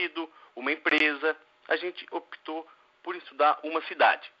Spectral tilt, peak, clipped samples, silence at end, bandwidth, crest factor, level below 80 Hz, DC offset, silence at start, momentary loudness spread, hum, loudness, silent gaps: 2 dB/octave; -8 dBFS; under 0.1%; 0.15 s; 7.4 kHz; 20 dB; under -90 dBFS; under 0.1%; 0 s; 16 LU; none; -27 LUFS; none